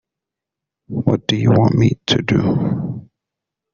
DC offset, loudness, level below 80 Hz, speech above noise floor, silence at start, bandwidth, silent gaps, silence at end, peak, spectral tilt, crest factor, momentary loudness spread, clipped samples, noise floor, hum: under 0.1%; -17 LUFS; -46 dBFS; 69 dB; 0.9 s; 7.2 kHz; none; 0.7 s; 0 dBFS; -6 dB/octave; 18 dB; 13 LU; under 0.1%; -84 dBFS; none